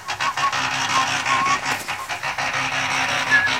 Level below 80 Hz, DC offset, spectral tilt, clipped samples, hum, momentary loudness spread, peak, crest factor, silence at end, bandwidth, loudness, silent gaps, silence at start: -54 dBFS; 0.2%; -1.5 dB/octave; under 0.1%; none; 7 LU; -4 dBFS; 18 dB; 0 s; 16.5 kHz; -20 LUFS; none; 0 s